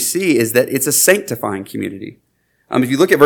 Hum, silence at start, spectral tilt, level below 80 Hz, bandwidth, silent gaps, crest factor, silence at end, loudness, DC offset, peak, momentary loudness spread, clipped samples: none; 0 s; -3.5 dB/octave; -60 dBFS; 19.5 kHz; none; 16 dB; 0 s; -15 LUFS; under 0.1%; 0 dBFS; 14 LU; 0.2%